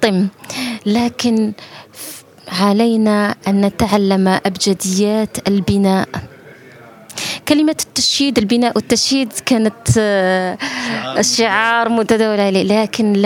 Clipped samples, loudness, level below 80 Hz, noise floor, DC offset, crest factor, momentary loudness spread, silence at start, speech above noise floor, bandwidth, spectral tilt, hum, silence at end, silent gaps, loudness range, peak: under 0.1%; -15 LUFS; -46 dBFS; -40 dBFS; under 0.1%; 16 dB; 10 LU; 0 s; 25 dB; 17 kHz; -4.5 dB/octave; none; 0 s; none; 3 LU; 0 dBFS